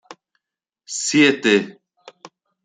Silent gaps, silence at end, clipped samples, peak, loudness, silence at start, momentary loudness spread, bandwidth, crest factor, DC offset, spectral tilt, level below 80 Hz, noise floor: none; 0.4 s; under 0.1%; -2 dBFS; -17 LUFS; 0.1 s; 15 LU; 9.6 kHz; 20 dB; under 0.1%; -3 dB/octave; -66 dBFS; -84 dBFS